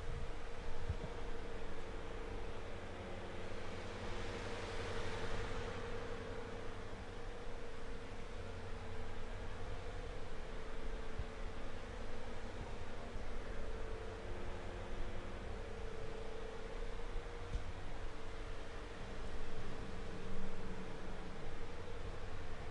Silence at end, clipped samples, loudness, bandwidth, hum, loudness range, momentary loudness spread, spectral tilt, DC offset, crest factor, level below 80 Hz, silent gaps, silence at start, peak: 0 s; under 0.1%; -48 LUFS; 10 kHz; none; 4 LU; 5 LU; -5.5 dB/octave; under 0.1%; 14 dB; -46 dBFS; none; 0 s; -26 dBFS